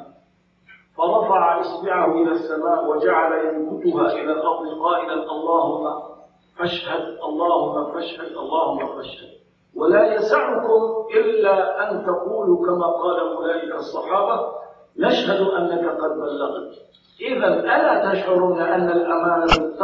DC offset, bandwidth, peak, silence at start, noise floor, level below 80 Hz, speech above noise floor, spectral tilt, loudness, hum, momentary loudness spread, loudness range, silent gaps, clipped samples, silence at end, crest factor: under 0.1%; 7.6 kHz; -2 dBFS; 0 s; -59 dBFS; -46 dBFS; 40 dB; -6 dB/octave; -20 LUFS; none; 11 LU; 4 LU; none; under 0.1%; 0 s; 18 dB